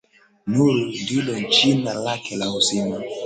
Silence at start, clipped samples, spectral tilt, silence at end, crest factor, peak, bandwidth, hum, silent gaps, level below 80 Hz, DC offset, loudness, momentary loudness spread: 0.45 s; under 0.1%; -4 dB/octave; 0 s; 18 dB; -4 dBFS; 9.4 kHz; none; none; -58 dBFS; under 0.1%; -20 LUFS; 10 LU